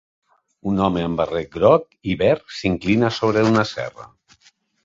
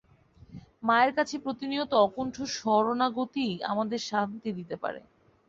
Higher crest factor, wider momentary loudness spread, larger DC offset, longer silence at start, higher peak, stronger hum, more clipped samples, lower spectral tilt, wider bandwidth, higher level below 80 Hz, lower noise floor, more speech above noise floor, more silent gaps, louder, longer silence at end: about the same, 18 dB vs 20 dB; about the same, 10 LU vs 12 LU; neither; first, 0.65 s vs 0.5 s; first, -2 dBFS vs -10 dBFS; neither; neither; first, -6.5 dB/octave vs -4.5 dB/octave; about the same, 7.8 kHz vs 8 kHz; first, -46 dBFS vs -66 dBFS; about the same, -58 dBFS vs -57 dBFS; first, 39 dB vs 29 dB; neither; first, -20 LUFS vs -28 LUFS; first, 0.8 s vs 0.5 s